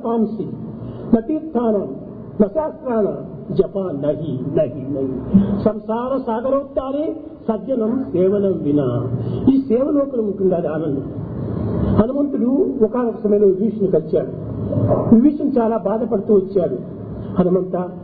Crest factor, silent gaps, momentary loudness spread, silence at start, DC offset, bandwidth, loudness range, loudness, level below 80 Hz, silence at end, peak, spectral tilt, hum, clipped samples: 18 dB; none; 10 LU; 0 s; under 0.1%; 4.7 kHz; 4 LU; -19 LUFS; -42 dBFS; 0 s; 0 dBFS; -13 dB/octave; none; under 0.1%